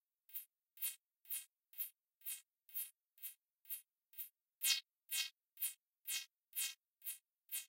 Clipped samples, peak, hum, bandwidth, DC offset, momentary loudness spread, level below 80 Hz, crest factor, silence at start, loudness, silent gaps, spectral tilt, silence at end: under 0.1%; -20 dBFS; none; 16 kHz; under 0.1%; 13 LU; under -90 dBFS; 28 dB; 0.3 s; -45 LUFS; none; 8.5 dB/octave; 0 s